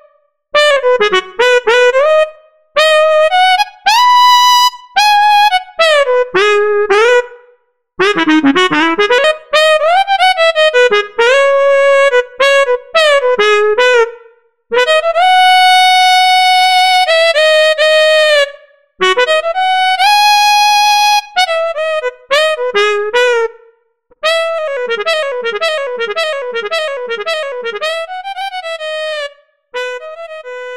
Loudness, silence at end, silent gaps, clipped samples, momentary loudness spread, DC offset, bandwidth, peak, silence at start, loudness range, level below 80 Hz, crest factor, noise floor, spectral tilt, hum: -10 LUFS; 0 s; none; under 0.1%; 11 LU; 1%; 16 kHz; 0 dBFS; 0.55 s; 8 LU; -56 dBFS; 10 dB; -53 dBFS; -1 dB/octave; none